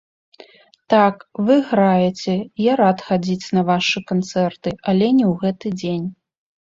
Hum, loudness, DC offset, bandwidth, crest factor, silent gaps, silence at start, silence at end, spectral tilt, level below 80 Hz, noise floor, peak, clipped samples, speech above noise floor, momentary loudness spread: none; -18 LUFS; under 0.1%; 7.6 kHz; 16 dB; none; 0.9 s; 0.5 s; -6.5 dB/octave; -58 dBFS; -47 dBFS; -2 dBFS; under 0.1%; 29 dB; 8 LU